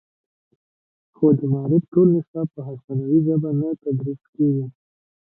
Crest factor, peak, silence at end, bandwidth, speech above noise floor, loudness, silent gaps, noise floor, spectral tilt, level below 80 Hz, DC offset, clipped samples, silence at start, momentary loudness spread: 16 dB; -6 dBFS; 0.55 s; 1.6 kHz; over 70 dB; -21 LUFS; 1.88-1.92 s, 2.28-2.34 s, 2.84-2.88 s, 4.29-4.33 s; under -90 dBFS; -16 dB/octave; -66 dBFS; under 0.1%; under 0.1%; 1.2 s; 12 LU